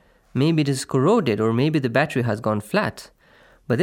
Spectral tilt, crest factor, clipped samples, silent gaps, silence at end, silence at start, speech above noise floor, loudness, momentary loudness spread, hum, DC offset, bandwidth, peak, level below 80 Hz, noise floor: -6.5 dB/octave; 18 dB; under 0.1%; none; 0 s; 0.35 s; 33 dB; -21 LUFS; 7 LU; none; under 0.1%; 17 kHz; -4 dBFS; -60 dBFS; -54 dBFS